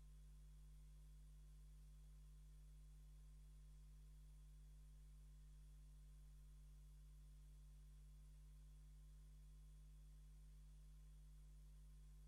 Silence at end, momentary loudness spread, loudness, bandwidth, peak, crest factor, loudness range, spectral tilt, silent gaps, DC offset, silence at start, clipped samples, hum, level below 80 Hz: 0 s; 0 LU; -67 LUFS; 12.5 kHz; -56 dBFS; 6 dB; 0 LU; -5.5 dB/octave; none; under 0.1%; 0 s; under 0.1%; 50 Hz at -65 dBFS; -64 dBFS